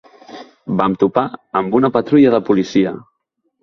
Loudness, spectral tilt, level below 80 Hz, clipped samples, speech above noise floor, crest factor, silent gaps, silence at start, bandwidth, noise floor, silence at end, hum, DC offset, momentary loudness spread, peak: -15 LUFS; -7.5 dB/octave; -54 dBFS; under 0.1%; 55 dB; 16 dB; none; 0.3 s; 6.4 kHz; -70 dBFS; 0.6 s; none; under 0.1%; 10 LU; 0 dBFS